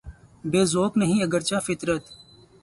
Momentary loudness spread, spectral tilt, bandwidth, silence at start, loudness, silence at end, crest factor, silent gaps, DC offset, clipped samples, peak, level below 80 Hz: 7 LU; -5 dB/octave; 11.5 kHz; 0.05 s; -24 LUFS; 0.45 s; 18 dB; none; under 0.1%; under 0.1%; -8 dBFS; -52 dBFS